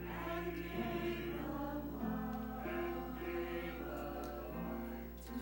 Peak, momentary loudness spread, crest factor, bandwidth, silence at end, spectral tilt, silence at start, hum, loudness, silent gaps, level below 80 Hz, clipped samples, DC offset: -28 dBFS; 4 LU; 14 dB; 16.5 kHz; 0 s; -6.5 dB/octave; 0 s; none; -43 LUFS; none; -52 dBFS; under 0.1%; under 0.1%